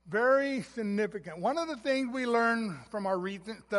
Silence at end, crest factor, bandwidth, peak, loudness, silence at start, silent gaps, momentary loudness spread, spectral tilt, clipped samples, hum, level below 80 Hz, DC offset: 0 s; 16 dB; 11.5 kHz; -14 dBFS; -31 LUFS; 0.05 s; none; 10 LU; -5.5 dB/octave; under 0.1%; none; -68 dBFS; under 0.1%